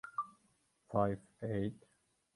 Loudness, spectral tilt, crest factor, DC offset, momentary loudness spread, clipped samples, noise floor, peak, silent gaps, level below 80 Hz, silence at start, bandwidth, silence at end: -39 LUFS; -8.5 dB/octave; 22 dB; under 0.1%; 9 LU; under 0.1%; -76 dBFS; -18 dBFS; none; -64 dBFS; 0.05 s; 11.5 kHz; 0.6 s